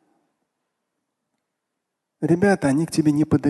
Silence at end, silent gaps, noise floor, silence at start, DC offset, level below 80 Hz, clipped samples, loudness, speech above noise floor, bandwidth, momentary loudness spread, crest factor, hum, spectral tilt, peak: 0 s; none; -80 dBFS; 2.2 s; under 0.1%; -52 dBFS; under 0.1%; -20 LUFS; 62 dB; 12.5 kHz; 4 LU; 18 dB; none; -7 dB/octave; -6 dBFS